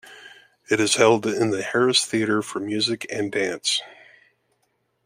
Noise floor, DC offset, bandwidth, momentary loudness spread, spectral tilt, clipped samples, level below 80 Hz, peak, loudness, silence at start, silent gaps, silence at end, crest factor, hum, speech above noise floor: -71 dBFS; under 0.1%; 16 kHz; 8 LU; -3 dB/octave; under 0.1%; -70 dBFS; -2 dBFS; -22 LUFS; 0.05 s; none; 1.1 s; 22 dB; none; 49 dB